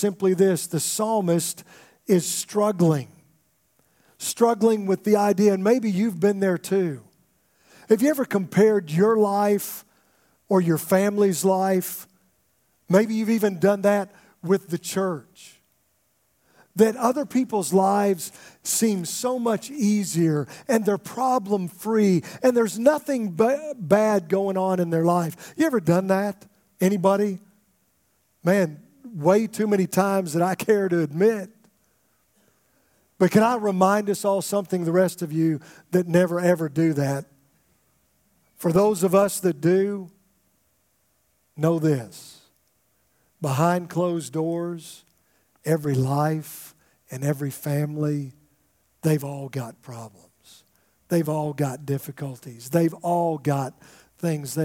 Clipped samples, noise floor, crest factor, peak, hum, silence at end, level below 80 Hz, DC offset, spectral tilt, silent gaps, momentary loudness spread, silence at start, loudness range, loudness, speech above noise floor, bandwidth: under 0.1%; -68 dBFS; 20 dB; -2 dBFS; none; 0 s; -70 dBFS; under 0.1%; -6 dB/octave; none; 12 LU; 0 s; 6 LU; -23 LUFS; 46 dB; 17 kHz